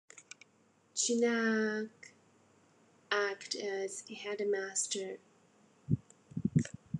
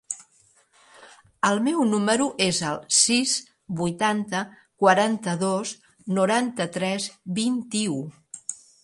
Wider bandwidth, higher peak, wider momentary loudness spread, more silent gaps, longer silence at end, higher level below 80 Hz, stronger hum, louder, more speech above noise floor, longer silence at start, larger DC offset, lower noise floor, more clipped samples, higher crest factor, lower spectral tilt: about the same, 11.5 kHz vs 11.5 kHz; second, -16 dBFS vs -4 dBFS; first, 22 LU vs 16 LU; neither; second, 0 s vs 0.3 s; about the same, -68 dBFS vs -68 dBFS; neither; second, -35 LUFS vs -23 LUFS; about the same, 34 dB vs 37 dB; about the same, 0.15 s vs 0.1 s; neither; first, -69 dBFS vs -61 dBFS; neither; about the same, 20 dB vs 22 dB; about the same, -4 dB/octave vs -3.5 dB/octave